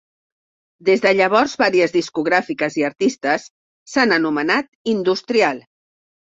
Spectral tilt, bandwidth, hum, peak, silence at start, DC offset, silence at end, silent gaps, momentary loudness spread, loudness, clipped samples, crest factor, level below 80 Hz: -4.5 dB/octave; 7.8 kHz; none; -2 dBFS; 0.85 s; under 0.1%; 0.7 s; 3.50-3.86 s, 4.68-4.85 s; 7 LU; -18 LUFS; under 0.1%; 18 dB; -62 dBFS